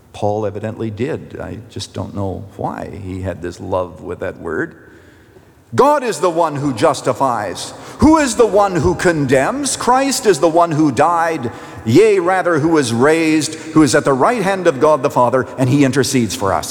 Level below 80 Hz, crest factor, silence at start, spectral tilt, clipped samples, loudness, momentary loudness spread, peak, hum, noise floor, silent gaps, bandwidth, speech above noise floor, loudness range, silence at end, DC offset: -44 dBFS; 14 dB; 0.15 s; -5 dB/octave; under 0.1%; -15 LUFS; 14 LU; -2 dBFS; none; -45 dBFS; none; 19.5 kHz; 30 dB; 11 LU; 0 s; under 0.1%